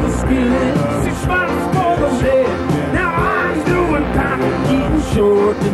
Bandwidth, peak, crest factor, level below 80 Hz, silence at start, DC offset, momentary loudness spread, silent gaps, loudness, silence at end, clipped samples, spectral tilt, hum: 14 kHz; -2 dBFS; 14 dB; -28 dBFS; 0 s; under 0.1%; 3 LU; none; -16 LUFS; 0 s; under 0.1%; -6.5 dB/octave; none